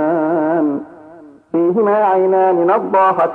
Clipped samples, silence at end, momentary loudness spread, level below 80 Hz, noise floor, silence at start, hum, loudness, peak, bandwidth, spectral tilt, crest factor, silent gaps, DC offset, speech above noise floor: under 0.1%; 0 s; 6 LU; -66 dBFS; -40 dBFS; 0 s; none; -14 LUFS; -2 dBFS; 4.2 kHz; -9.5 dB/octave; 12 dB; none; under 0.1%; 27 dB